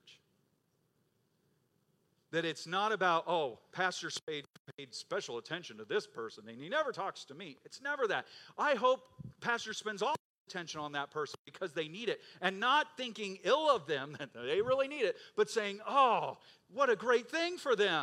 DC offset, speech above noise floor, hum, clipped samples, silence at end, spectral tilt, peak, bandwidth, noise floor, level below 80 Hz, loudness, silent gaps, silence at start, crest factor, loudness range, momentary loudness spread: under 0.1%; 42 dB; none; under 0.1%; 0 s; -3.5 dB/octave; -14 dBFS; 13.5 kHz; -77 dBFS; -82 dBFS; -35 LUFS; 4.23-4.27 s, 4.59-4.65 s, 10.19-10.46 s, 11.39-11.45 s; 0.05 s; 22 dB; 7 LU; 15 LU